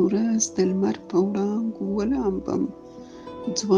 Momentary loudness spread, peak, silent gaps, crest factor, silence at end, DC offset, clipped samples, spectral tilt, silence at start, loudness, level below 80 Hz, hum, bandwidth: 16 LU; -8 dBFS; none; 16 dB; 0 s; under 0.1%; under 0.1%; -5.5 dB/octave; 0 s; -25 LUFS; -52 dBFS; none; 10.5 kHz